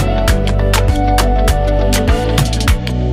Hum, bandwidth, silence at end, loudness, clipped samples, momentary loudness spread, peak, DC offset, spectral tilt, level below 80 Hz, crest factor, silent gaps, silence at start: none; 16 kHz; 0 s; -14 LUFS; under 0.1%; 1 LU; 0 dBFS; under 0.1%; -5 dB/octave; -14 dBFS; 12 dB; none; 0 s